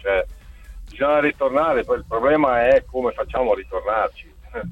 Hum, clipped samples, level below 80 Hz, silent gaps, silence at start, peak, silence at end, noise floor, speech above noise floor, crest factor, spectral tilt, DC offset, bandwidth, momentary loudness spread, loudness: none; under 0.1%; -40 dBFS; none; 0 s; -4 dBFS; 0 s; -39 dBFS; 19 dB; 16 dB; -7 dB/octave; under 0.1%; 8.2 kHz; 10 LU; -20 LUFS